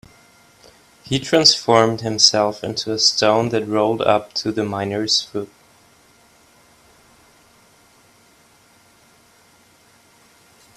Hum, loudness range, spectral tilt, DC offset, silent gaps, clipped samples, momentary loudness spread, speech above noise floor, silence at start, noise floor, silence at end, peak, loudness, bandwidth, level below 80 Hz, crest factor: none; 10 LU; -3 dB/octave; under 0.1%; none; under 0.1%; 11 LU; 35 dB; 1.05 s; -53 dBFS; 5.3 s; 0 dBFS; -17 LUFS; 15.5 kHz; -60 dBFS; 22 dB